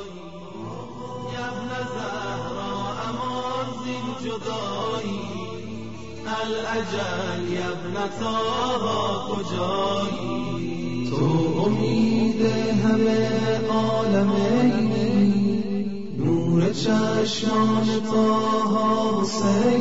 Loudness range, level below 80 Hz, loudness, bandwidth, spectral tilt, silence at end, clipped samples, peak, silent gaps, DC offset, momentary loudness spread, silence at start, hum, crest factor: 8 LU; -50 dBFS; -24 LUFS; 7.8 kHz; -6 dB/octave; 0 s; under 0.1%; -10 dBFS; none; 1%; 11 LU; 0 s; none; 14 dB